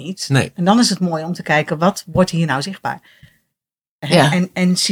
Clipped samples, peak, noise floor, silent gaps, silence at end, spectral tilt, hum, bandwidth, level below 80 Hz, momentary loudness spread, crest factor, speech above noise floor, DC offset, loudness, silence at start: under 0.1%; 0 dBFS; -87 dBFS; 3.89-3.99 s; 0 s; -5 dB/octave; none; 16 kHz; -50 dBFS; 11 LU; 18 dB; 70 dB; under 0.1%; -17 LUFS; 0 s